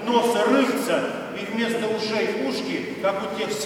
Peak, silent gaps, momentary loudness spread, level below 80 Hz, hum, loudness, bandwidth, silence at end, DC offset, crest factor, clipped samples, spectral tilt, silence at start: -6 dBFS; none; 8 LU; -66 dBFS; none; -24 LUFS; 17 kHz; 0 s; under 0.1%; 16 dB; under 0.1%; -4 dB/octave; 0 s